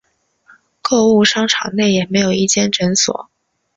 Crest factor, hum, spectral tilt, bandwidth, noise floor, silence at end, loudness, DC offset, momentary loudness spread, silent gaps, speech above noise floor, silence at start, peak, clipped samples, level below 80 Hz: 16 dB; none; -3.5 dB/octave; 8 kHz; -52 dBFS; 0.55 s; -14 LUFS; under 0.1%; 6 LU; none; 38 dB; 0.85 s; 0 dBFS; under 0.1%; -54 dBFS